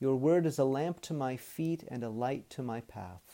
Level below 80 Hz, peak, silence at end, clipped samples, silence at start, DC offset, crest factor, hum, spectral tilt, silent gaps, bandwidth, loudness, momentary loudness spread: -70 dBFS; -18 dBFS; 0 s; under 0.1%; 0 s; under 0.1%; 16 dB; none; -7 dB/octave; none; 17 kHz; -34 LUFS; 12 LU